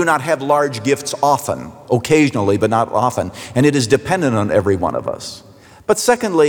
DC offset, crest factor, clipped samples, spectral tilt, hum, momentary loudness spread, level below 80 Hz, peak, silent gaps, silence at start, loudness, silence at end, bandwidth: under 0.1%; 14 dB; under 0.1%; -5 dB/octave; none; 10 LU; -52 dBFS; -2 dBFS; none; 0 s; -16 LUFS; 0 s; over 20 kHz